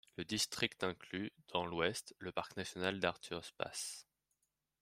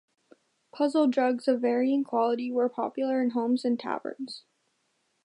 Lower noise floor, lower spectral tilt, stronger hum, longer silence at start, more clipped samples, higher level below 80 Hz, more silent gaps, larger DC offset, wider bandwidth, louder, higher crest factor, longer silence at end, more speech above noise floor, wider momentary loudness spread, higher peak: first, -85 dBFS vs -74 dBFS; second, -3 dB/octave vs -5.5 dB/octave; neither; second, 0.2 s vs 0.75 s; neither; first, -74 dBFS vs -84 dBFS; neither; neither; first, 16 kHz vs 10.5 kHz; second, -41 LUFS vs -27 LUFS; first, 24 dB vs 16 dB; about the same, 0.8 s vs 0.85 s; second, 44 dB vs 48 dB; about the same, 9 LU vs 10 LU; second, -18 dBFS vs -12 dBFS